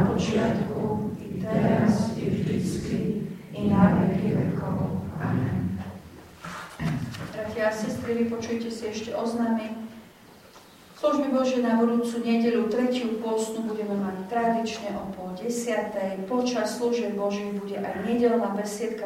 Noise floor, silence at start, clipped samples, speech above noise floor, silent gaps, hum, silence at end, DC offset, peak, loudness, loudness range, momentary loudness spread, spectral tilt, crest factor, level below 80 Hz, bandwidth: -50 dBFS; 0 s; under 0.1%; 24 dB; none; none; 0 s; under 0.1%; -6 dBFS; -27 LUFS; 5 LU; 10 LU; -6.5 dB/octave; 20 dB; -54 dBFS; 16 kHz